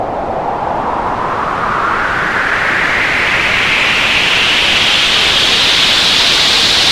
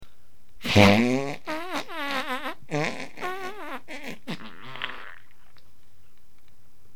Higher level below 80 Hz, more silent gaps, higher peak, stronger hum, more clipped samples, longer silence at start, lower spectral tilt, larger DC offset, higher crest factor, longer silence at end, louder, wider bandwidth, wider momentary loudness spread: first, -34 dBFS vs -52 dBFS; neither; about the same, 0 dBFS vs -2 dBFS; neither; neither; about the same, 0 s vs 0 s; second, -1.5 dB/octave vs -5.5 dB/octave; second, under 0.1% vs 2%; second, 12 dB vs 28 dB; second, 0 s vs 1.8 s; first, -10 LUFS vs -26 LUFS; second, 17 kHz vs 19 kHz; second, 9 LU vs 20 LU